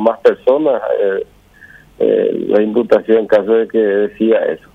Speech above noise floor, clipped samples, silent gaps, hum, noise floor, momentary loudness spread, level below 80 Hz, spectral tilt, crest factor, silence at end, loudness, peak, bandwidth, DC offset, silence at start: 29 dB; under 0.1%; none; none; -42 dBFS; 4 LU; -54 dBFS; -7.5 dB/octave; 14 dB; 0.15 s; -14 LUFS; 0 dBFS; 5.8 kHz; under 0.1%; 0 s